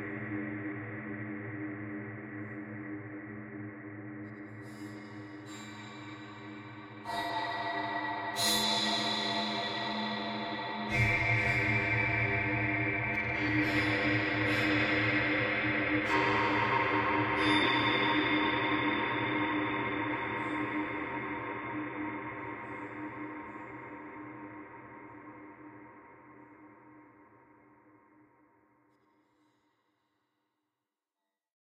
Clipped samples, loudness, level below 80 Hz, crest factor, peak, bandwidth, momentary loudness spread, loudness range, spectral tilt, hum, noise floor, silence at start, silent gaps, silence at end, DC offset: under 0.1%; -31 LUFS; -58 dBFS; 20 dB; -14 dBFS; 15.5 kHz; 18 LU; 17 LU; -4.5 dB/octave; none; under -90 dBFS; 0 s; none; 4.4 s; under 0.1%